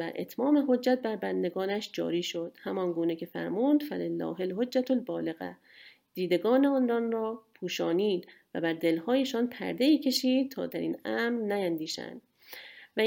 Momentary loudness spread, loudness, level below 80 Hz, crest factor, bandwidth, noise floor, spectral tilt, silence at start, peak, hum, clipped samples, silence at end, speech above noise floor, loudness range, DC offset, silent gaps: 11 LU; -30 LUFS; -80 dBFS; 16 dB; 17 kHz; -49 dBFS; -5 dB/octave; 0 s; -14 dBFS; none; under 0.1%; 0 s; 20 dB; 2 LU; under 0.1%; none